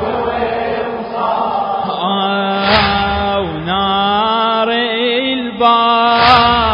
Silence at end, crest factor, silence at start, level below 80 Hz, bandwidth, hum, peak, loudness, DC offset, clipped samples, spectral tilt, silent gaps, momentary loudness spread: 0 s; 14 dB; 0 s; -34 dBFS; 8 kHz; none; 0 dBFS; -13 LUFS; under 0.1%; under 0.1%; -6.5 dB/octave; none; 9 LU